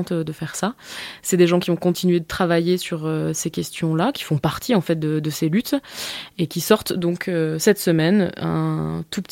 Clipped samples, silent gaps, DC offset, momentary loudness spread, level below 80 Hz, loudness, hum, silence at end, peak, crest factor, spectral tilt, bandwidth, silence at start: under 0.1%; none; under 0.1%; 9 LU; -52 dBFS; -21 LUFS; none; 0.1 s; -2 dBFS; 20 dB; -5.5 dB/octave; 17 kHz; 0 s